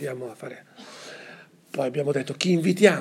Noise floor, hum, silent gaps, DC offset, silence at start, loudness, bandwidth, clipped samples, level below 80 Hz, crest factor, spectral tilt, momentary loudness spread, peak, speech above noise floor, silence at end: -48 dBFS; none; none; under 0.1%; 0 s; -24 LUFS; 15 kHz; under 0.1%; -80 dBFS; 24 dB; -5.5 dB/octave; 23 LU; -2 dBFS; 24 dB; 0 s